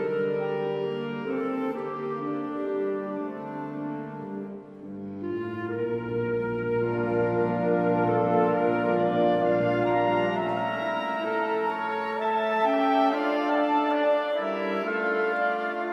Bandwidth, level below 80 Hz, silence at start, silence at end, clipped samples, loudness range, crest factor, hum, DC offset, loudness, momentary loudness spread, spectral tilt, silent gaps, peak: 7.4 kHz; -64 dBFS; 0 s; 0 s; under 0.1%; 9 LU; 14 dB; none; under 0.1%; -27 LUFS; 11 LU; -8 dB/octave; none; -12 dBFS